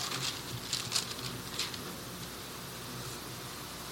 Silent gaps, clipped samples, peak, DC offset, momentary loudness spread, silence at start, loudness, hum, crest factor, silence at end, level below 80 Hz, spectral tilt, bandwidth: none; under 0.1%; -16 dBFS; under 0.1%; 9 LU; 0 s; -37 LUFS; none; 24 dB; 0 s; -60 dBFS; -2 dB/octave; 17.5 kHz